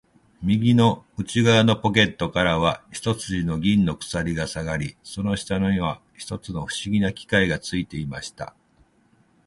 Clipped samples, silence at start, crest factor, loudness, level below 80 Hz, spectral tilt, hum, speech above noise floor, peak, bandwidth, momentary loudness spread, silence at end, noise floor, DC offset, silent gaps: under 0.1%; 0.4 s; 22 dB; -23 LUFS; -44 dBFS; -5.5 dB/octave; none; 38 dB; -2 dBFS; 11.5 kHz; 14 LU; 1 s; -61 dBFS; under 0.1%; none